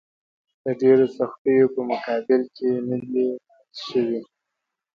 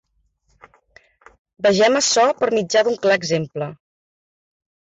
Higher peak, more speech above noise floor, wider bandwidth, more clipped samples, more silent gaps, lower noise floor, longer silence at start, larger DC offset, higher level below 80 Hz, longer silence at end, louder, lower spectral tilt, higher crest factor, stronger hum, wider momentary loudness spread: about the same, -6 dBFS vs -6 dBFS; first, 61 dB vs 48 dB; second, 6.6 kHz vs 8.4 kHz; neither; first, 1.38-1.45 s vs none; first, -82 dBFS vs -65 dBFS; second, 0.65 s vs 1.6 s; neither; second, -68 dBFS vs -62 dBFS; second, 0.7 s vs 1.2 s; second, -22 LUFS vs -18 LUFS; first, -7.5 dB/octave vs -3 dB/octave; about the same, 16 dB vs 14 dB; neither; first, 14 LU vs 11 LU